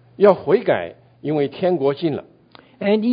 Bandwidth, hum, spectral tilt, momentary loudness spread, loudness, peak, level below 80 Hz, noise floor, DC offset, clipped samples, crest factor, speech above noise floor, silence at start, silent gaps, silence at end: 5.2 kHz; none; -9.5 dB/octave; 13 LU; -19 LUFS; 0 dBFS; -62 dBFS; -49 dBFS; under 0.1%; under 0.1%; 20 dB; 31 dB; 0.2 s; none; 0 s